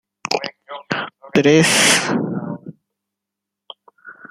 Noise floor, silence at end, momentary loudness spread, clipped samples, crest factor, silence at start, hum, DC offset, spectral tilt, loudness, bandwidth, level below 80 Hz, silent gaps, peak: -83 dBFS; 0.2 s; 19 LU; under 0.1%; 20 dB; 0.25 s; none; under 0.1%; -3 dB/octave; -16 LUFS; 15 kHz; -62 dBFS; none; 0 dBFS